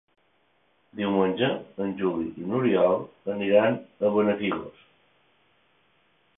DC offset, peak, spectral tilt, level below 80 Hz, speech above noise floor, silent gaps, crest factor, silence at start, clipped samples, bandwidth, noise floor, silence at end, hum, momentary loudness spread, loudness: under 0.1%; -6 dBFS; -10.5 dB/octave; -64 dBFS; 43 dB; none; 20 dB; 0.95 s; under 0.1%; 3.9 kHz; -67 dBFS; 1.7 s; none; 11 LU; -25 LUFS